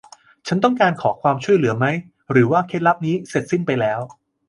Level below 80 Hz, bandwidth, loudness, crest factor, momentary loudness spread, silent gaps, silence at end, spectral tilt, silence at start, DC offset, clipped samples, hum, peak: -60 dBFS; 11.5 kHz; -19 LUFS; 18 dB; 9 LU; none; 0.35 s; -7 dB/octave; 0.45 s; under 0.1%; under 0.1%; none; -2 dBFS